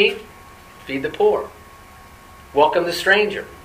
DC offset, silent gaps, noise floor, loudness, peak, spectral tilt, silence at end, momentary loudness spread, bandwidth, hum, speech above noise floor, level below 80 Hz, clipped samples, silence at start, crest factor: under 0.1%; none; -43 dBFS; -19 LUFS; 0 dBFS; -3.5 dB/octave; 0.05 s; 17 LU; 15.5 kHz; none; 25 dB; -50 dBFS; under 0.1%; 0 s; 20 dB